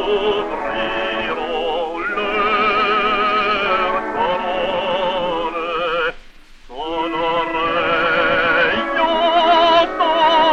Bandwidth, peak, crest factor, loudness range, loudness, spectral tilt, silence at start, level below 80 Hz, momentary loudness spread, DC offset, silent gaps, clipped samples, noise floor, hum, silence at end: 8.8 kHz; -2 dBFS; 16 dB; 5 LU; -17 LUFS; -4.5 dB/octave; 0 s; -42 dBFS; 8 LU; 0.3%; none; under 0.1%; -40 dBFS; none; 0 s